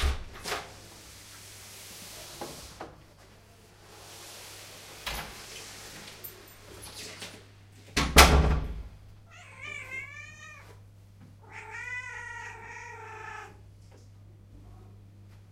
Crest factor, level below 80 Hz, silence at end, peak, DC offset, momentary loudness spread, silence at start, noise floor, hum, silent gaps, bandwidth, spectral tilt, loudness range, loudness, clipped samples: 30 dB; -38 dBFS; 0 s; -2 dBFS; under 0.1%; 20 LU; 0 s; -55 dBFS; none; none; 16 kHz; -3.5 dB/octave; 19 LU; -29 LUFS; under 0.1%